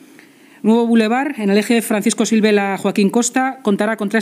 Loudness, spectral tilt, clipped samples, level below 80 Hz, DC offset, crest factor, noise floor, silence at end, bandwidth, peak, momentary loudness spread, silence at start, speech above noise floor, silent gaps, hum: -16 LUFS; -4.5 dB/octave; under 0.1%; -78 dBFS; under 0.1%; 14 dB; -45 dBFS; 0 s; 15.5 kHz; -2 dBFS; 5 LU; 0.65 s; 30 dB; none; none